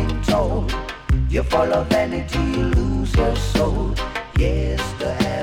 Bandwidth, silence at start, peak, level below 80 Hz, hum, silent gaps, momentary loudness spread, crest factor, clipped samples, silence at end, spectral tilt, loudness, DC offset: 16 kHz; 0 s; -4 dBFS; -24 dBFS; none; none; 5 LU; 16 dB; under 0.1%; 0 s; -6 dB/octave; -21 LUFS; under 0.1%